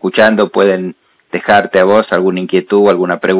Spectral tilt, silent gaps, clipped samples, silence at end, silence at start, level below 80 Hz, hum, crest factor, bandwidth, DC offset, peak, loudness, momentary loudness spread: -10 dB/octave; none; under 0.1%; 0 s; 0.05 s; -52 dBFS; none; 12 dB; 4 kHz; under 0.1%; 0 dBFS; -11 LUFS; 9 LU